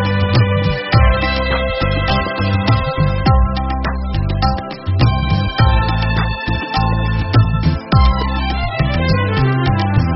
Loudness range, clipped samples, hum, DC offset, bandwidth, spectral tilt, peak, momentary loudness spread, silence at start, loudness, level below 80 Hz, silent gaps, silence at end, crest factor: 1 LU; under 0.1%; none; under 0.1%; 6 kHz; -5.5 dB/octave; 0 dBFS; 5 LU; 0 s; -16 LUFS; -20 dBFS; none; 0 s; 14 dB